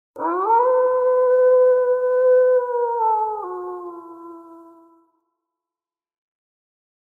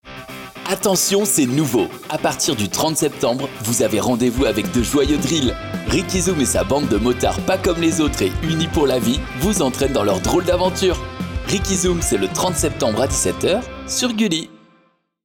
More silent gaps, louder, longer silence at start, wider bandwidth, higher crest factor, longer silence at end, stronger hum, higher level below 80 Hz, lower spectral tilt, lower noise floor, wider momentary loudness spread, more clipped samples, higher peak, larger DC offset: neither; about the same, -18 LUFS vs -18 LUFS; about the same, 0.15 s vs 0.05 s; second, 2.4 kHz vs 17 kHz; about the same, 12 dB vs 12 dB; first, 2.6 s vs 0.7 s; neither; second, -82 dBFS vs -34 dBFS; first, -7 dB/octave vs -4 dB/octave; first, under -90 dBFS vs -59 dBFS; first, 17 LU vs 6 LU; neither; about the same, -8 dBFS vs -6 dBFS; neither